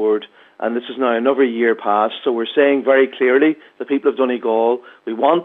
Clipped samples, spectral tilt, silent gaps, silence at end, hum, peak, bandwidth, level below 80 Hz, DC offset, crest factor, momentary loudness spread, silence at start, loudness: under 0.1%; -7.5 dB/octave; none; 0 s; none; 0 dBFS; 4 kHz; -82 dBFS; under 0.1%; 16 dB; 9 LU; 0 s; -17 LUFS